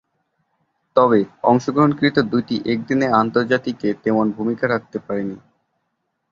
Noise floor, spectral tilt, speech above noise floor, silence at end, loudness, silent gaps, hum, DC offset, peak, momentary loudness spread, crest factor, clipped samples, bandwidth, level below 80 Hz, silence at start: -73 dBFS; -7 dB/octave; 55 dB; 0.95 s; -19 LUFS; none; none; under 0.1%; -2 dBFS; 9 LU; 18 dB; under 0.1%; 7.4 kHz; -58 dBFS; 0.95 s